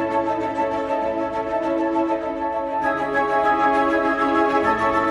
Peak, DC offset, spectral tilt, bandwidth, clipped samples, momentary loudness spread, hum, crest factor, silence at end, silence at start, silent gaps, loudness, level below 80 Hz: -8 dBFS; under 0.1%; -6 dB/octave; 11.5 kHz; under 0.1%; 6 LU; none; 14 dB; 0 s; 0 s; none; -21 LUFS; -50 dBFS